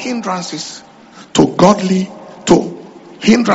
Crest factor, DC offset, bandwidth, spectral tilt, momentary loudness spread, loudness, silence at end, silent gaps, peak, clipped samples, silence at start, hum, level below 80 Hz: 14 dB; under 0.1%; 8.2 kHz; -5 dB/octave; 17 LU; -14 LUFS; 0 s; none; 0 dBFS; under 0.1%; 0 s; none; -46 dBFS